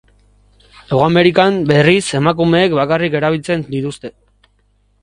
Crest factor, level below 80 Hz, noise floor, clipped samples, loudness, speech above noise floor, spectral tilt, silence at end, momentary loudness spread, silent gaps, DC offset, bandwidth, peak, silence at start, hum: 16 dB; -46 dBFS; -57 dBFS; under 0.1%; -14 LUFS; 44 dB; -6 dB/octave; 0.9 s; 11 LU; none; under 0.1%; 11.5 kHz; 0 dBFS; 0.9 s; 50 Hz at -40 dBFS